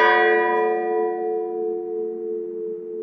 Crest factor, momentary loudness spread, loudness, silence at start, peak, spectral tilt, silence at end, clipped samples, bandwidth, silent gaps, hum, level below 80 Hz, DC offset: 18 dB; 12 LU; -23 LUFS; 0 s; -4 dBFS; -5.5 dB/octave; 0 s; under 0.1%; 6 kHz; none; none; under -90 dBFS; under 0.1%